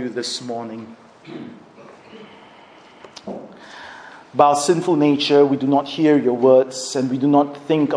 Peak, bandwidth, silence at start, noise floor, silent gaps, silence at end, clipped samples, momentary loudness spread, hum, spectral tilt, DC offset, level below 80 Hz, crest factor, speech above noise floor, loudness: 0 dBFS; 10.5 kHz; 0 s; -46 dBFS; none; 0 s; under 0.1%; 22 LU; none; -5 dB/octave; under 0.1%; -70 dBFS; 18 dB; 28 dB; -17 LUFS